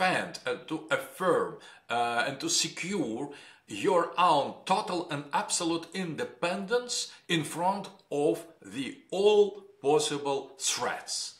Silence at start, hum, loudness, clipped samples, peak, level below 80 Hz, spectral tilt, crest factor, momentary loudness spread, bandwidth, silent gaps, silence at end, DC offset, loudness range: 0 s; none; -30 LUFS; under 0.1%; -10 dBFS; -76 dBFS; -3 dB/octave; 20 dB; 12 LU; 16 kHz; none; 0.1 s; under 0.1%; 2 LU